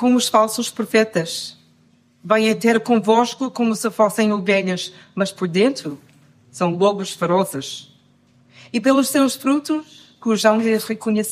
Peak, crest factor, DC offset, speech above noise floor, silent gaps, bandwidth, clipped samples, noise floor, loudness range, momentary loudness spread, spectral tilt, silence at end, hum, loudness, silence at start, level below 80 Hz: -2 dBFS; 18 dB; under 0.1%; 38 dB; none; 15.5 kHz; under 0.1%; -56 dBFS; 3 LU; 11 LU; -4.5 dB/octave; 0 s; none; -19 LUFS; 0 s; -70 dBFS